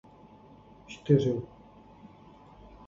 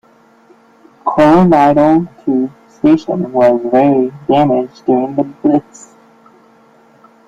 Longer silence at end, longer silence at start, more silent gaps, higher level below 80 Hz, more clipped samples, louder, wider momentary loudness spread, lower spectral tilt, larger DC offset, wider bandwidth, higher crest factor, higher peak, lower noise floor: second, 1.4 s vs 1.65 s; second, 0.9 s vs 1.05 s; neither; second, -60 dBFS vs -48 dBFS; neither; second, -27 LUFS vs -12 LUFS; first, 28 LU vs 9 LU; about the same, -8.5 dB/octave vs -8 dB/octave; neither; about the same, 7.4 kHz vs 7.8 kHz; first, 24 dB vs 12 dB; second, -10 dBFS vs 0 dBFS; first, -54 dBFS vs -47 dBFS